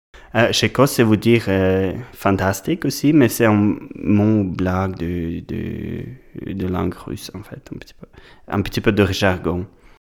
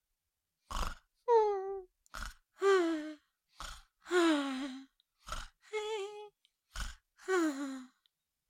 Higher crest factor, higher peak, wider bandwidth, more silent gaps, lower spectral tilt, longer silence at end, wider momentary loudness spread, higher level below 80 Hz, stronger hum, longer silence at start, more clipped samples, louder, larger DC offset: about the same, 18 dB vs 20 dB; first, 0 dBFS vs -18 dBFS; first, 18.5 kHz vs 16 kHz; neither; first, -6 dB/octave vs -4 dB/octave; second, 0.45 s vs 0.65 s; second, 16 LU vs 20 LU; first, -42 dBFS vs -52 dBFS; neither; second, 0.15 s vs 0.7 s; neither; first, -19 LUFS vs -35 LUFS; neither